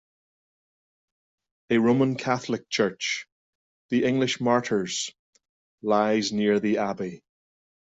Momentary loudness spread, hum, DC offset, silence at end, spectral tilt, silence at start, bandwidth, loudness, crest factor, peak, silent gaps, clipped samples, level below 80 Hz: 9 LU; none; under 0.1%; 0.75 s; -4.5 dB/octave; 1.7 s; 8.4 kHz; -25 LUFS; 18 dB; -8 dBFS; 3.32-3.89 s, 5.19-5.33 s, 5.49-5.78 s; under 0.1%; -66 dBFS